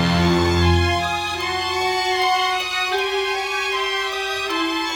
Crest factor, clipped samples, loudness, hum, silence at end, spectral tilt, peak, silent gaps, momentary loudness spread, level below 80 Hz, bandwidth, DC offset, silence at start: 14 dB; under 0.1%; -20 LUFS; none; 0 s; -4.5 dB/octave; -6 dBFS; none; 5 LU; -36 dBFS; 19 kHz; under 0.1%; 0 s